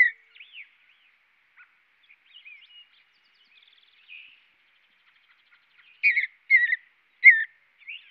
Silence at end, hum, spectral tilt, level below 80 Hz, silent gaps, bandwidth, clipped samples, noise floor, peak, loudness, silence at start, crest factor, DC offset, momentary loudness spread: 0.15 s; none; 2 dB/octave; under -90 dBFS; none; 5.2 kHz; under 0.1%; -65 dBFS; -2 dBFS; -19 LUFS; 0 s; 26 dB; under 0.1%; 26 LU